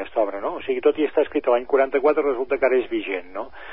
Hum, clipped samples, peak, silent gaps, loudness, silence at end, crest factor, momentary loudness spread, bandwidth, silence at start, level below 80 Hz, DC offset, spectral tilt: none; under 0.1%; -6 dBFS; none; -22 LUFS; 0 s; 16 dB; 9 LU; 5.2 kHz; 0 s; -56 dBFS; 0.8%; -9 dB/octave